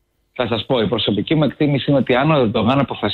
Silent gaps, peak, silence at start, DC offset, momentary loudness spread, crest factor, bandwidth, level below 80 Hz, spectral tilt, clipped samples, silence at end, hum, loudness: none; -4 dBFS; 0.35 s; under 0.1%; 6 LU; 14 dB; 4.6 kHz; -48 dBFS; -9 dB/octave; under 0.1%; 0 s; none; -17 LUFS